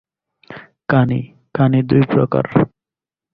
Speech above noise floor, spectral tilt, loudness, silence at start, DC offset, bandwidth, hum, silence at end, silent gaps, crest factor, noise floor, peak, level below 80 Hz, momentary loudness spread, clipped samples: 74 dB; -11 dB/octave; -16 LUFS; 0.5 s; under 0.1%; 5 kHz; none; 0.65 s; none; 16 dB; -89 dBFS; -2 dBFS; -48 dBFS; 16 LU; under 0.1%